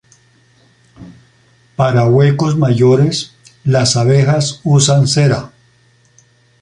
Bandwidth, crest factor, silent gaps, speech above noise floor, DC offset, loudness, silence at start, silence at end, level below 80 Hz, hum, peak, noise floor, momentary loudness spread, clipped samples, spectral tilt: 11 kHz; 14 dB; none; 41 dB; under 0.1%; -12 LUFS; 1 s; 1.15 s; -48 dBFS; none; 0 dBFS; -52 dBFS; 10 LU; under 0.1%; -5.5 dB/octave